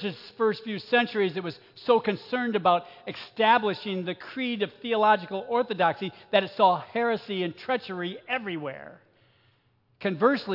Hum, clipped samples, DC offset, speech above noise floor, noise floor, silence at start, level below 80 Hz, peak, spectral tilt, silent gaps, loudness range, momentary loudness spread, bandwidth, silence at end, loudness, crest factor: none; under 0.1%; under 0.1%; 40 dB; -67 dBFS; 0 s; -78 dBFS; -8 dBFS; -7 dB/octave; none; 5 LU; 13 LU; 5.8 kHz; 0 s; -26 LUFS; 20 dB